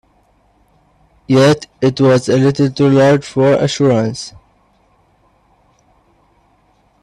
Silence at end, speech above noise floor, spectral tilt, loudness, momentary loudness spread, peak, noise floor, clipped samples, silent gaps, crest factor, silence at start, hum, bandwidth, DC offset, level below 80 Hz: 2.75 s; 43 dB; -6.5 dB/octave; -13 LUFS; 6 LU; 0 dBFS; -55 dBFS; under 0.1%; none; 16 dB; 1.3 s; 50 Hz at -55 dBFS; 11.5 kHz; under 0.1%; -50 dBFS